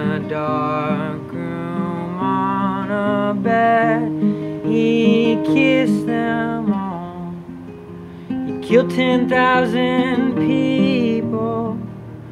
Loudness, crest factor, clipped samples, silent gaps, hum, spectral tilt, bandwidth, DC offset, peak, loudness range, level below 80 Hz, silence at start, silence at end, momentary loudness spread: -18 LUFS; 16 dB; under 0.1%; none; none; -7.5 dB/octave; 12 kHz; under 0.1%; -2 dBFS; 4 LU; -52 dBFS; 0 s; 0 s; 14 LU